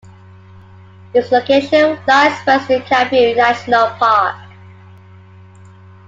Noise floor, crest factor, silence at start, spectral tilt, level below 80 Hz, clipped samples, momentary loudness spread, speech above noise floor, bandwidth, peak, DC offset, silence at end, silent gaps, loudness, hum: -40 dBFS; 16 dB; 1.15 s; -4.5 dB/octave; -58 dBFS; under 0.1%; 5 LU; 27 dB; 7.8 kHz; 0 dBFS; under 0.1%; 1.6 s; none; -13 LUFS; none